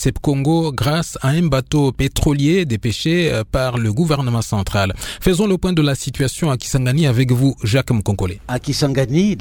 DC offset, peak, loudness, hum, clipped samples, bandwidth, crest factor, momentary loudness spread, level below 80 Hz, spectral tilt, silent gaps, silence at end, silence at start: under 0.1%; 0 dBFS; -17 LUFS; none; under 0.1%; 18 kHz; 16 dB; 4 LU; -32 dBFS; -6 dB/octave; none; 0 s; 0 s